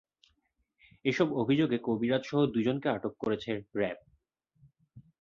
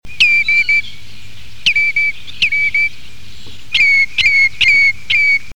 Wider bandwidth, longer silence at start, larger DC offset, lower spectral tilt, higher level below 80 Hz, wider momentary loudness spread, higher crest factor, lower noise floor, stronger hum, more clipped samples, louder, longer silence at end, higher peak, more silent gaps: second, 7.4 kHz vs 17.5 kHz; first, 1.05 s vs 0 s; second, under 0.1% vs 7%; first, -7 dB/octave vs 0 dB/octave; second, -68 dBFS vs -44 dBFS; about the same, 7 LU vs 8 LU; about the same, 18 dB vs 14 dB; first, -77 dBFS vs -38 dBFS; neither; neither; second, -31 LUFS vs -11 LUFS; first, 0.2 s vs 0 s; second, -14 dBFS vs 0 dBFS; neither